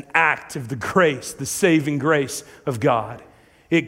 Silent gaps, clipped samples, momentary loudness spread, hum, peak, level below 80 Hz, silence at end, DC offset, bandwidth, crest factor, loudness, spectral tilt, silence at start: none; under 0.1%; 11 LU; none; 0 dBFS; -58 dBFS; 0 s; under 0.1%; 16 kHz; 20 dB; -21 LUFS; -5 dB/octave; 0 s